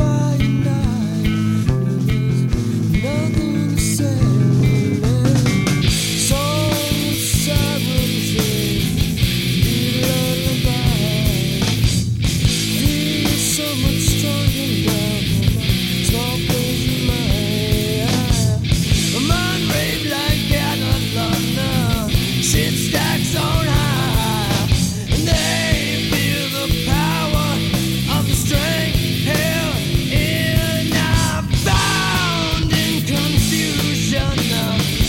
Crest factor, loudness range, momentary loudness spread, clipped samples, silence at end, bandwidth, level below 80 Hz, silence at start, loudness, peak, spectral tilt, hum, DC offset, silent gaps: 14 dB; 1 LU; 2 LU; under 0.1%; 0 s; 16.5 kHz; -28 dBFS; 0 s; -17 LUFS; -4 dBFS; -4.5 dB/octave; none; under 0.1%; none